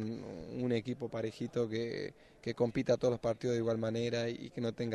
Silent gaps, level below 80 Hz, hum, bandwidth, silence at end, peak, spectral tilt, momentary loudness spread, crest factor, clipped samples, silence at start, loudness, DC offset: none; -64 dBFS; none; 11 kHz; 0 s; -18 dBFS; -6.5 dB/octave; 11 LU; 18 dB; under 0.1%; 0 s; -36 LUFS; under 0.1%